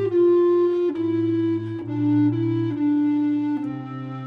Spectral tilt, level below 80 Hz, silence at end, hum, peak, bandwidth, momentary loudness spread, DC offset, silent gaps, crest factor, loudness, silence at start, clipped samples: -10.5 dB/octave; -70 dBFS; 0 s; none; -12 dBFS; 4.8 kHz; 10 LU; under 0.1%; none; 10 dB; -22 LUFS; 0 s; under 0.1%